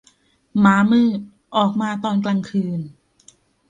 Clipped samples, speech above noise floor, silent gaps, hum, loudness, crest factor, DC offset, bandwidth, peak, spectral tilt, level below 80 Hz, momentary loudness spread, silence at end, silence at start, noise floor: under 0.1%; 40 dB; none; none; -19 LUFS; 16 dB; under 0.1%; 9 kHz; -4 dBFS; -7 dB/octave; -60 dBFS; 13 LU; 0.8 s; 0.55 s; -58 dBFS